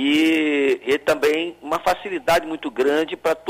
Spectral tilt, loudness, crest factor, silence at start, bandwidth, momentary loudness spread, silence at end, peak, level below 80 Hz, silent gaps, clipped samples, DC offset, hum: -4 dB/octave; -20 LUFS; 12 dB; 0 s; 16 kHz; 6 LU; 0 s; -8 dBFS; -54 dBFS; none; under 0.1%; under 0.1%; none